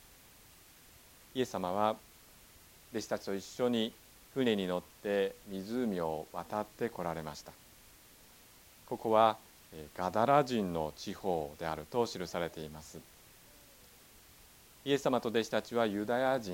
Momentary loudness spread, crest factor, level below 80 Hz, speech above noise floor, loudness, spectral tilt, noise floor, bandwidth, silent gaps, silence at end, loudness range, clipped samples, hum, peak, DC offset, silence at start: 16 LU; 24 dB; -66 dBFS; 25 dB; -34 LUFS; -5 dB/octave; -59 dBFS; 17.5 kHz; none; 0 s; 7 LU; under 0.1%; none; -12 dBFS; under 0.1%; 1.35 s